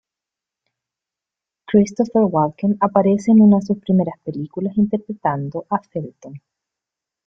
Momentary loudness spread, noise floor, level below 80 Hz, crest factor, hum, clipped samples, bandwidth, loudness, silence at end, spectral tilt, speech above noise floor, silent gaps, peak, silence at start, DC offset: 14 LU; -87 dBFS; -58 dBFS; 18 dB; none; under 0.1%; 7.4 kHz; -18 LUFS; 0.9 s; -8.5 dB/octave; 69 dB; none; -2 dBFS; 1.7 s; under 0.1%